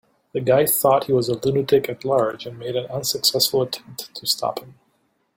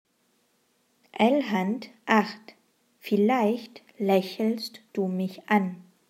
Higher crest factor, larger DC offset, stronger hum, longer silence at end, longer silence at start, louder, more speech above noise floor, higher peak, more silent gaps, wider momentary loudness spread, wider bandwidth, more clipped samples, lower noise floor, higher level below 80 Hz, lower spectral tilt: about the same, 20 dB vs 22 dB; neither; neither; first, 0.65 s vs 0.3 s; second, 0.35 s vs 1.15 s; first, -20 LUFS vs -26 LUFS; about the same, 46 dB vs 44 dB; first, -2 dBFS vs -6 dBFS; neither; about the same, 12 LU vs 12 LU; about the same, 17 kHz vs 16 kHz; neither; about the same, -67 dBFS vs -69 dBFS; first, -60 dBFS vs -84 dBFS; second, -3.5 dB/octave vs -6.5 dB/octave